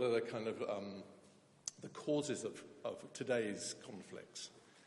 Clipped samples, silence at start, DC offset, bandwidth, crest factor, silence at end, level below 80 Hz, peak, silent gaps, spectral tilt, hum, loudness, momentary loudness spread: under 0.1%; 0 s; under 0.1%; 11.5 kHz; 20 dB; 0 s; -88 dBFS; -22 dBFS; none; -4 dB/octave; none; -43 LUFS; 13 LU